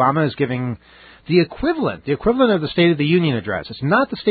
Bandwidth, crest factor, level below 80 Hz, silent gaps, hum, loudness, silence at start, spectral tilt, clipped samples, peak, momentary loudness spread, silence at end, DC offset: 4.8 kHz; 16 dB; -46 dBFS; none; none; -19 LUFS; 0 s; -12 dB/octave; under 0.1%; -2 dBFS; 8 LU; 0 s; under 0.1%